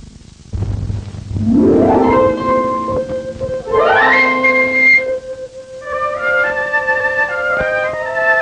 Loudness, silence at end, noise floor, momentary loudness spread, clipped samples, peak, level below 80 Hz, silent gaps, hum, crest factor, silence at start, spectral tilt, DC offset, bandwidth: -13 LUFS; 0 s; -37 dBFS; 15 LU; under 0.1%; -2 dBFS; -34 dBFS; none; none; 12 dB; 0 s; -6.5 dB/octave; under 0.1%; 9.4 kHz